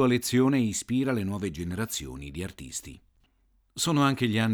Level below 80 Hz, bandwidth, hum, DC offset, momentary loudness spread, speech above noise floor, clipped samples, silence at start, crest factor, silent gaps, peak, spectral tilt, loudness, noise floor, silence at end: -54 dBFS; over 20 kHz; none; under 0.1%; 14 LU; 41 dB; under 0.1%; 0 s; 18 dB; none; -10 dBFS; -5 dB/octave; -28 LUFS; -67 dBFS; 0 s